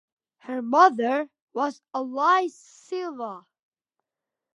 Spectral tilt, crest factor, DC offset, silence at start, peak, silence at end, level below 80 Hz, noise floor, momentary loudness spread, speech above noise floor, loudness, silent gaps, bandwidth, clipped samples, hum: -4 dB/octave; 22 dB; under 0.1%; 0.45 s; -4 dBFS; 1.15 s; -88 dBFS; -88 dBFS; 17 LU; 63 dB; -24 LUFS; 1.42-1.48 s; 11 kHz; under 0.1%; none